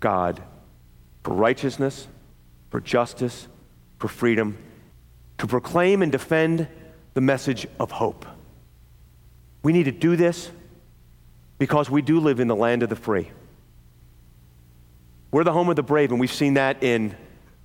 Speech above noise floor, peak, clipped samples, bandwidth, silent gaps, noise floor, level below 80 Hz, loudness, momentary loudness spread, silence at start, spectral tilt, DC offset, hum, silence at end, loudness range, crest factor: 29 dB; -6 dBFS; under 0.1%; 17 kHz; none; -51 dBFS; -54 dBFS; -23 LUFS; 14 LU; 0 s; -6.5 dB/octave; under 0.1%; none; 0.4 s; 4 LU; 18 dB